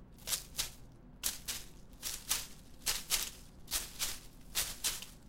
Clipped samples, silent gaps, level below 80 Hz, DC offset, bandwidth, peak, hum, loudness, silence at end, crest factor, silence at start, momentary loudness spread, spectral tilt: under 0.1%; none; -54 dBFS; under 0.1%; 17 kHz; -12 dBFS; none; -37 LUFS; 0 s; 28 dB; 0 s; 11 LU; 0 dB/octave